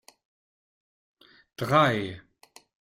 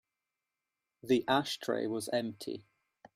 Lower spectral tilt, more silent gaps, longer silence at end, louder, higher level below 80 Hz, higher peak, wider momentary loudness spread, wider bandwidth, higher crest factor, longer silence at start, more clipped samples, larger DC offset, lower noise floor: first, -6 dB/octave vs -4.5 dB/octave; neither; first, 0.8 s vs 0.55 s; first, -25 LUFS vs -33 LUFS; first, -66 dBFS vs -74 dBFS; first, -8 dBFS vs -16 dBFS; first, 25 LU vs 15 LU; about the same, 16 kHz vs 16 kHz; about the same, 22 dB vs 20 dB; first, 1.6 s vs 1.05 s; neither; neither; about the same, under -90 dBFS vs -89 dBFS